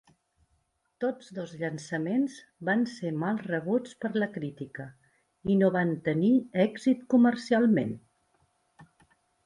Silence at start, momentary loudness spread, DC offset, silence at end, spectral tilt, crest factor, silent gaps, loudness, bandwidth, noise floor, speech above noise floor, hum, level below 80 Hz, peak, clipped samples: 1 s; 14 LU; under 0.1%; 0.65 s; -7.5 dB/octave; 18 dB; none; -28 LUFS; 11 kHz; -74 dBFS; 46 dB; none; -68 dBFS; -12 dBFS; under 0.1%